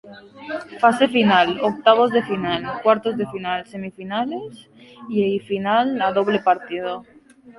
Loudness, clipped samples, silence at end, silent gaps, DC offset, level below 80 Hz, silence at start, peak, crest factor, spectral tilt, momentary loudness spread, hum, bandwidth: -20 LUFS; under 0.1%; 0.05 s; none; under 0.1%; -60 dBFS; 0.05 s; -2 dBFS; 20 dB; -6 dB/octave; 16 LU; none; 11.5 kHz